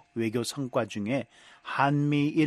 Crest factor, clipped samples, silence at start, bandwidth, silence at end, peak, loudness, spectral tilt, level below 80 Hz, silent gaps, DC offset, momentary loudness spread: 18 dB; under 0.1%; 0.15 s; 13 kHz; 0 s; -10 dBFS; -29 LUFS; -6 dB/octave; -70 dBFS; none; under 0.1%; 9 LU